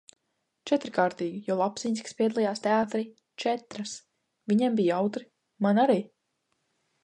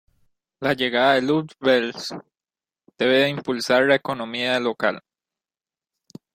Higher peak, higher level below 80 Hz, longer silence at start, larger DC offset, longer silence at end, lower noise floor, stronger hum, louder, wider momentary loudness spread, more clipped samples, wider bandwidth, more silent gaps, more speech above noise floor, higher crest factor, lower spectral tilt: second, -10 dBFS vs -4 dBFS; second, -76 dBFS vs -66 dBFS; about the same, 0.65 s vs 0.6 s; neither; second, 0.95 s vs 1.35 s; second, -79 dBFS vs under -90 dBFS; neither; second, -28 LUFS vs -21 LUFS; first, 15 LU vs 11 LU; neither; second, 10.5 kHz vs 16 kHz; neither; second, 52 dB vs over 69 dB; about the same, 18 dB vs 20 dB; about the same, -5.5 dB/octave vs -4.5 dB/octave